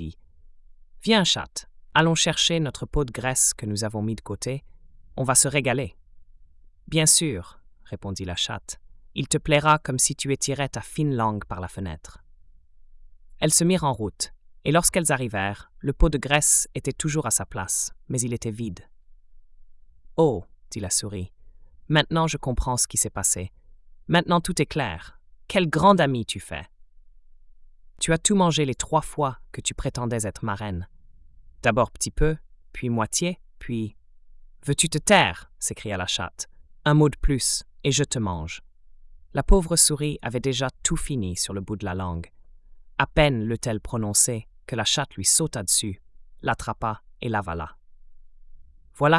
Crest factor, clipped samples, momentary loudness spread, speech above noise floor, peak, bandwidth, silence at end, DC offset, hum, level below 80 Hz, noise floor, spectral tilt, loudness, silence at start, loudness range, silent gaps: 20 dB; under 0.1%; 16 LU; 27 dB; -4 dBFS; 12 kHz; 0 s; under 0.1%; none; -38 dBFS; -51 dBFS; -3.5 dB/octave; -23 LUFS; 0 s; 5 LU; none